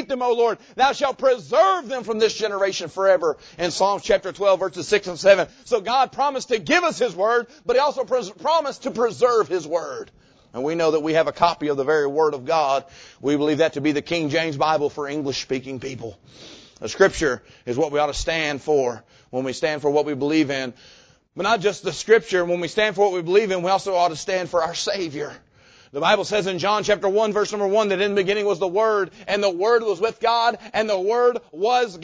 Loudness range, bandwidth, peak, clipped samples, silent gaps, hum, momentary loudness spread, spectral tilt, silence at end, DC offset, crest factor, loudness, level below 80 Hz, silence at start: 3 LU; 8 kHz; -2 dBFS; under 0.1%; none; none; 8 LU; -4 dB/octave; 0 s; under 0.1%; 18 dB; -21 LUFS; -52 dBFS; 0 s